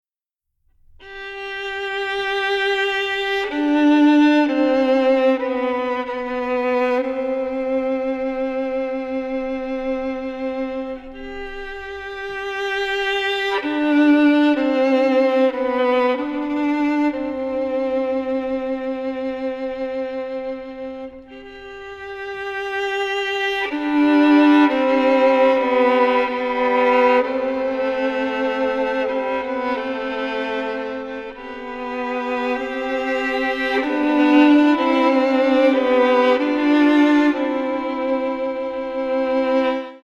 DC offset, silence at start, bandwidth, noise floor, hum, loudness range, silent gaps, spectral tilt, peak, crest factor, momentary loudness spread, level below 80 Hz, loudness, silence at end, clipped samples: under 0.1%; 1 s; 7.6 kHz; -82 dBFS; none; 10 LU; none; -4.5 dB/octave; -4 dBFS; 16 dB; 14 LU; -50 dBFS; -19 LUFS; 0.05 s; under 0.1%